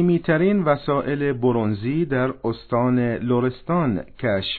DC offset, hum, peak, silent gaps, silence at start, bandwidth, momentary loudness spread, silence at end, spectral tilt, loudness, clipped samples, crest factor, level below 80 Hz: under 0.1%; none; -4 dBFS; none; 0 s; 4.5 kHz; 5 LU; 0 s; -10.5 dB/octave; -22 LUFS; under 0.1%; 16 dB; -48 dBFS